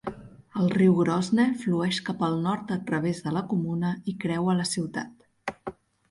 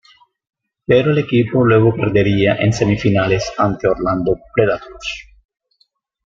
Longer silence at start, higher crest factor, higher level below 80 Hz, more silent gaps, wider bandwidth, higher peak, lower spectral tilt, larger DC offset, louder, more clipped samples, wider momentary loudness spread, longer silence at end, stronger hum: second, 0.05 s vs 0.9 s; about the same, 16 dB vs 14 dB; second, -62 dBFS vs -42 dBFS; neither; first, 11.5 kHz vs 7.6 kHz; second, -10 dBFS vs -2 dBFS; about the same, -6 dB/octave vs -7 dB/octave; neither; second, -26 LUFS vs -16 LUFS; neither; first, 15 LU vs 11 LU; second, 0.4 s vs 1.05 s; neither